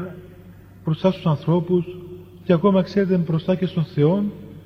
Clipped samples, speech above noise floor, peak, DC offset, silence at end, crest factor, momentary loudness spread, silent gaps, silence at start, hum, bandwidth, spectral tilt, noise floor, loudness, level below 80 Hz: under 0.1%; 24 dB; -4 dBFS; under 0.1%; 0.05 s; 16 dB; 16 LU; none; 0 s; none; 6.4 kHz; -9.5 dB/octave; -44 dBFS; -21 LUFS; -54 dBFS